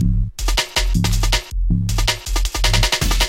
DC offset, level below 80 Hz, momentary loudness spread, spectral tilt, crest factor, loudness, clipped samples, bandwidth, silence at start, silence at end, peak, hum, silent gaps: under 0.1%; -20 dBFS; 5 LU; -3.5 dB/octave; 16 dB; -19 LUFS; under 0.1%; 17 kHz; 0 s; 0 s; -2 dBFS; none; none